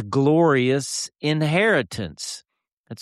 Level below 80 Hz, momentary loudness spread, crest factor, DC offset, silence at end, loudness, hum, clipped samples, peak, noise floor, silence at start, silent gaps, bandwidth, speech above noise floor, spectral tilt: -58 dBFS; 14 LU; 14 dB; under 0.1%; 0 s; -21 LUFS; none; under 0.1%; -8 dBFS; -43 dBFS; 0 s; 2.72-2.84 s; 13 kHz; 22 dB; -5 dB/octave